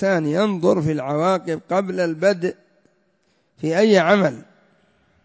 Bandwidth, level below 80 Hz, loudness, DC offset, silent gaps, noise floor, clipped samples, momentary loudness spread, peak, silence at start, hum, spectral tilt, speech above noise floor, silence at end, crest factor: 8 kHz; -62 dBFS; -19 LUFS; under 0.1%; none; -65 dBFS; under 0.1%; 9 LU; -4 dBFS; 0 s; none; -6.5 dB/octave; 46 dB; 0.85 s; 18 dB